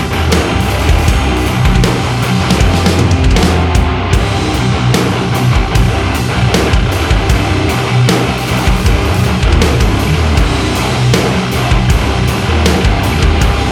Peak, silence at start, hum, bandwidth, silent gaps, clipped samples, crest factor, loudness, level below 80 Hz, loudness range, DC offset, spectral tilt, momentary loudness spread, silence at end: 0 dBFS; 0 s; none; 17 kHz; none; under 0.1%; 10 dB; -12 LUFS; -16 dBFS; 1 LU; under 0.1%; -5.5 dB/octave; 3 LU; 0 s